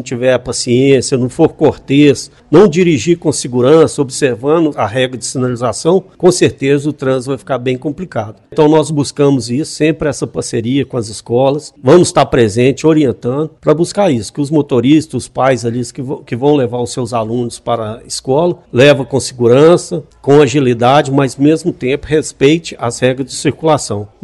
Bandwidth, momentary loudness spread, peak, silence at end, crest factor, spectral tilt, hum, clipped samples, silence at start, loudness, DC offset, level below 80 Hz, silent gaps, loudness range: 12 kHz; 10 LU; 0 dBFS; 0.2 s; 12 dB; -5.5 dB/octave; none; 0.3%; 0 s; -12 LUFS; under 0.1%; -44 dBFS; none; 4 LU